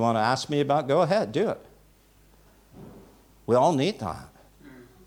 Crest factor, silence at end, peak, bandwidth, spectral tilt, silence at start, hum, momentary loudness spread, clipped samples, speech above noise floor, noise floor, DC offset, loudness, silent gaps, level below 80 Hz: 18 dB; 0.25 s; -10 dBFS; over 20 kHz; -6 dB/octave; 0 s; 50 Hz at -60 dBFS; 15 LU; under 0.1%; 34 dB; -58 dBFS; under 0.1%; -25 LUFS; none; -60 dBFS